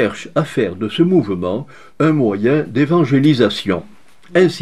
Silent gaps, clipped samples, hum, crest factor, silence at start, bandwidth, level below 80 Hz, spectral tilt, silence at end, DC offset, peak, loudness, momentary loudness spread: none; under 0.1%; none; 16 dB; 0 s; 12 kHz; -58 dBFS; -7 dB/octave; 0 s; 0.7%; 0 dBFS; -16 LUFS; 8 LU